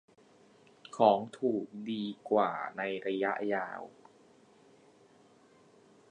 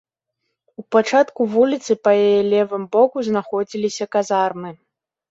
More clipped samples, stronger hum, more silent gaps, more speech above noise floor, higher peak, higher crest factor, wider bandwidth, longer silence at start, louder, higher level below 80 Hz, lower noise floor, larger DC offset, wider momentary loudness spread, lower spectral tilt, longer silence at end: neither; neither; neither; second, 31 dB vs 59 dB; second, -10 dBFS vs -2 dBFS; first, 26 dB vs 16 dB; first, 10 kHz vs 8 kHz; first, 0.95 s vs 0.8 s; second, -32 LUFS vs -18 LUFS; second, -82 dBFS vs -66 dBFS; second, -62 dBFS vs -77 dBFS; neither; first, 14 LU vs 8 LU; about the same, -6 dB/octave vs -5 dB/octave; first, 2.2 s vs 0.55 s